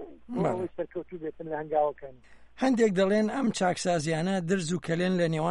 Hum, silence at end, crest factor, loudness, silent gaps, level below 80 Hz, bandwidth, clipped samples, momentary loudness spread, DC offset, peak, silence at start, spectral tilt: none; 0 s; 14 dB; -28 LUFS; none; -62 dBFS; 11.5 kHz; under 0.1%; 13 LU; under 0.1%; -14 dBFS; 0 s; -5.5 dB/octave